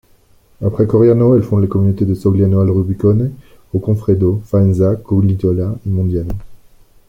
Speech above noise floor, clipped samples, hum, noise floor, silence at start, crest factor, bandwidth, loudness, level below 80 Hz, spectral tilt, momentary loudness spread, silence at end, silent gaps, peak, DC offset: 37 dB; under 0.1%; none; -49 dBFS; 0.6 s; 12 dB; 4.5 kHz; -14 LUFS; -38 dBFS; -11.5 dB/octave; 10 LU; 0.55 s; none; -2 dBFS; under 0.1%